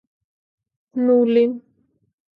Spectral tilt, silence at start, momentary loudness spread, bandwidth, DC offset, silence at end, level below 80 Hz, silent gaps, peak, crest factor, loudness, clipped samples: -9 dB/octave; 0.95 s; 16 LU; 4.8 kHz; under 0.1%; 0.8 s; -76 dBFS; none; -6 dBFS; 16 dB; -18 LUFS; under 0.1%